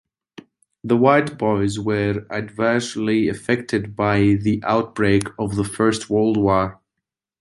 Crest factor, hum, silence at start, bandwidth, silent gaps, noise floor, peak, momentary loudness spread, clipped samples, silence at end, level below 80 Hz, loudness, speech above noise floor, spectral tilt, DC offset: 18 dB; none; 0.85 s; 11.5 kHz; none; -83 dBFS; -2 dBFS; 7 LU; under 0.1%; 0.7 s; -46 dBFS; -20 LUFS; 64 dB; -6.5 dB/octave; under 0.1%